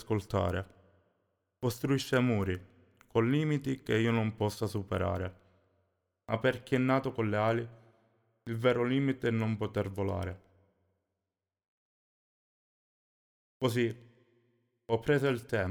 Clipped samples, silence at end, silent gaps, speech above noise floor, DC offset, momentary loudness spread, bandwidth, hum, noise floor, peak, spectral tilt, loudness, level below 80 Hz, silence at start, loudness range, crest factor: under 0.1%; 0 s; 11.68-13.60 s; over 59 dB; under 0.1%; 10 LU; 19.5 kHz; none; under -90 dBFS; -14 dBFS; -7 dB/octave; -32 LUFS; -62 dBFS; 0 s; 8 LU; 18 dB